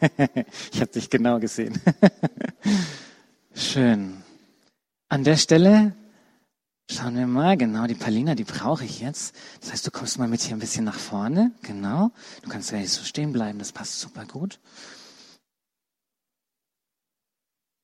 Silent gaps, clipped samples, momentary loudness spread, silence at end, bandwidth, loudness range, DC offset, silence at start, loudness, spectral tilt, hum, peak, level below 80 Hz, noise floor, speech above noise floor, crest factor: none; under 0.1%; 15 LU; 2.8 s; 12.5 kHz; 11 LU; under 0.1%; 0 s; -23 LUFS; -5 dB/octave; none; -2 dBFS; -62 dBFS; -87 dBFS; 64 dB; 22 dB